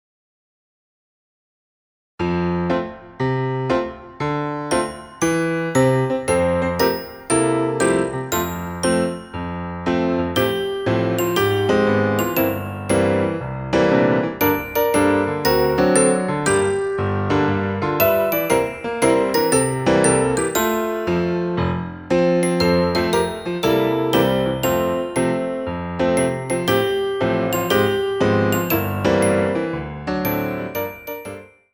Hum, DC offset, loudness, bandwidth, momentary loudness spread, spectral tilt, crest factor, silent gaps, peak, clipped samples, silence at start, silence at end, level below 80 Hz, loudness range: none; under 0.1%; -19 LUFS; over 20 kHz; 8 LU; -5 dB/octave; 18 dB; none; -2 dBFS; under 0.1%; 2.2 s; 0.3 s; -44 dBFS; 4 LU